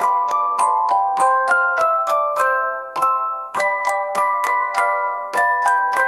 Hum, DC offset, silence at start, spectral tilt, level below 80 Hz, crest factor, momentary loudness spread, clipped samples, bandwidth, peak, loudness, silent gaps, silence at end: none; under 0.1%; 0 s; -1 dB/octave; -72 dBFS; 14 dB; 5 LU; under 0.1%; 15.5 kHz; -4 dBFS; -18 LUFS; none; 0 s